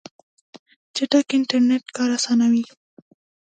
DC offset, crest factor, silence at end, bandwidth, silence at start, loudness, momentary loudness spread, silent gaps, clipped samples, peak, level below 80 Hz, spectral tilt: under 0.1%; 18 dB; 0.8 s; 9.2 kHz; 0.95 s; -20 LUFS; 9 LU; none; under 0.1%; -4 dBFS; -74 dBFS; -3 dB/octave